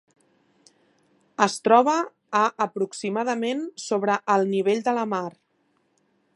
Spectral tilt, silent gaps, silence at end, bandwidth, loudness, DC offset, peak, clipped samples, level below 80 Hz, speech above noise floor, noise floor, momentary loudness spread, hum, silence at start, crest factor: -4.5 dB/octave; none; 1.05 s; 11.5 kHz; -23 LUFS; under 0.1%; -2 dBFS; under 0.1%; -80 dBFS; 46 dB; -69 dBFS; 10 LU; none; 1.4 s; 22 dB